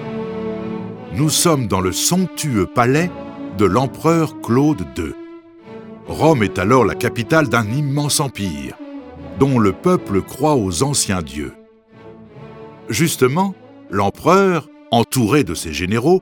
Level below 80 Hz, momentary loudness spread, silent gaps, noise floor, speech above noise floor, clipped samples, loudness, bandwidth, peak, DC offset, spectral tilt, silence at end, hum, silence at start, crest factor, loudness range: -44 dBFS; 17 LU; none; -43 dBFS; 27 dB; under 0.1%; -17 LUFS; 19 kHz; 0 dBFS; under 0.1%; -5 dB/octave; 0 s; none; 0 s; 18 dB; 3 LU